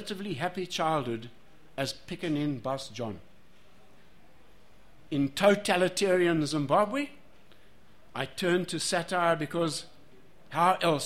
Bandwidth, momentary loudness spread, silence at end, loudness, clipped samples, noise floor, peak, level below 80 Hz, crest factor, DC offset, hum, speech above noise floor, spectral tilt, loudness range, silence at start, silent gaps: 16 kHz; 13 LU; 0 s; -29 LUFS; under 0.1%; -60 dBFS; -10 dBFS; -62 dBFS; 22 dB; 0.4%; none; 32 dB; -4.5 dB/octave; 9 LU; 0 s; none